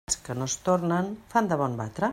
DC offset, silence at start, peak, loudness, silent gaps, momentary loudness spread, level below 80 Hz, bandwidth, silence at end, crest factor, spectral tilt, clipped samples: under 0.1%; 0.1 s; -8 dBFS; -27 LUFS; none; 5 LU; -56 dBFS; 15.5 kHz; 0 s; 18 dB; -5 dB/octave; under 0.1%